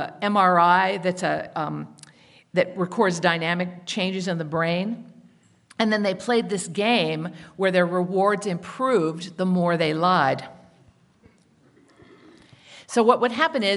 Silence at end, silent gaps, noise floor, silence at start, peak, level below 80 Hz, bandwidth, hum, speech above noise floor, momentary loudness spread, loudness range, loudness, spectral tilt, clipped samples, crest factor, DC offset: 0 s; none; -58 dBFS; 0 s; -2 dBFS; -70 dBFS; 11.5 kHz; none; 36 dB; 11 LU; 4 LU; -23 LUFS; -5 dB/octave; under 0.1%; 22 dB; under 0.1%